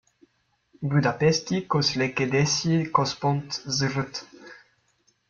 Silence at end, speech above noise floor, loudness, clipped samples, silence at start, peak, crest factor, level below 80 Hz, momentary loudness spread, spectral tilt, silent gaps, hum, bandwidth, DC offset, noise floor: 0.75 s; 45 dB; -24 LUFS; under 0.1%; 0.8 s; -6 dBFS; 20 dB; -60 dBFS; 9 LU; -4.5 dB/octave; none; none; 7.4 kHz; under 0.1%; -69 dBFS